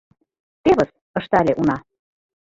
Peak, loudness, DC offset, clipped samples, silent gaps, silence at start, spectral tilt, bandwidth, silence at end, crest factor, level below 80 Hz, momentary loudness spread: -4 dBFS; -20 LUFS; under 0.1%; under 0.1%; 1.01-1.14 s; 0.65 s; -7.5 dB/octave; 7.8 kHz; 0.75 s; 18 dB; -50 dBFS; 10 LU